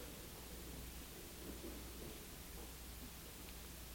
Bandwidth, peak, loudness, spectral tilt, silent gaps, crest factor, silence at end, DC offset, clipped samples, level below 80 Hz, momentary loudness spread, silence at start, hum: 17 kHz; -38 dBFS; -52 LUFS; -3.5 dB/octave; none; 14 dB; 0 s; under 0.1%; under 0.1%; -56 dBFS; 2 LU; 0 s; none